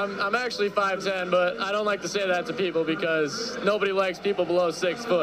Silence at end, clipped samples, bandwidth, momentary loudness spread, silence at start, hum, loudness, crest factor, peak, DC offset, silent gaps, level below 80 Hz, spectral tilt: 0 s; under 0.1%; 15.5 kHz; 3 LU; 0 s; none; -25 LUFS; 16 dB; -10 dBFS; under 0.1%; none; -64 dBFS; -4 dB/octave